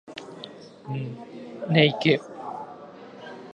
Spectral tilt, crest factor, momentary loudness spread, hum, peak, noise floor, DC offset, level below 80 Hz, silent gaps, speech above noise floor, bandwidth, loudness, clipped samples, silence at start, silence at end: -7 dB/octave; 26 dB; 23 LU; none; -2 dBFS; -44 dBFS; under 0.1%; -70 dBFS; none; 21 dB; 9 kHz; -25 LUFS; under 0.1%; 0.05 s; 0.05 s